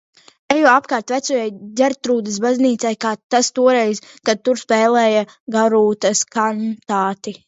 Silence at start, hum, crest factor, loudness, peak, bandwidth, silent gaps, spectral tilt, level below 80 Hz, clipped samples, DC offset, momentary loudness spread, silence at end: 0.5 s; none; 16 dB; -17 LUFS; 0 dBFS; 8 kHz; 3.23-3.30 s, 5.40-5.46 s; -3.5 dB/octave; -66 dBFS; under 0.1%; under 0.1%; 8 LU; 0.15 s